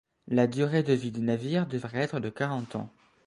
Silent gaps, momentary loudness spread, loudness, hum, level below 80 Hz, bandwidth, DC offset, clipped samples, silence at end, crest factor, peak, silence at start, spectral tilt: none; 10 LU; -29 LUFS; none; -66 dBFS; 11 kHz; under 0.1%; under 0.1%; 0.4 s; 18 dB; -10 dBFS; 0.25 s; -7.5 dB/octave